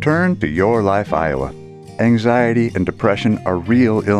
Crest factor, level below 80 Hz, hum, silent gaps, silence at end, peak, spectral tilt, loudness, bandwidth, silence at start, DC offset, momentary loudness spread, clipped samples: 14 dB; -42 dBFS; none; none; 0 s; -2 dBFS; -8 dB/octave; -16 LUFS; 10.5 kHz; 0 s; under 0.1%; 7 LU; under 0.1%